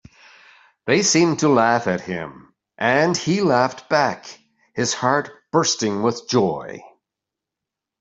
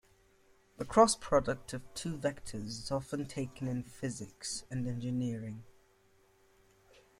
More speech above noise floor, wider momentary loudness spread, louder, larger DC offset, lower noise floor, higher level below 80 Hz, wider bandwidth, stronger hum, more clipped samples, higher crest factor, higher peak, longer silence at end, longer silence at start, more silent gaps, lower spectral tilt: first, 66 dB vs 33 dB; about the same, 16 LU vs 16 LU; first, -19 LUFS vs -35 LUFS; neither; first, -85 dBFS vs -67 dBFS; about the same, -62 dBFS vs -58 dBFS; second, 8.2 kHz vs 15.5 kHz; neither; neither; second, 18 dB vs 24 dB; first, -2 dBFS vs -12 dBFS; second, 1.15 s vs 1.5 s; about the same, 0.85 s vs 0.8 s; neither; about the same, -4 dB/octave vs -5 dB/octave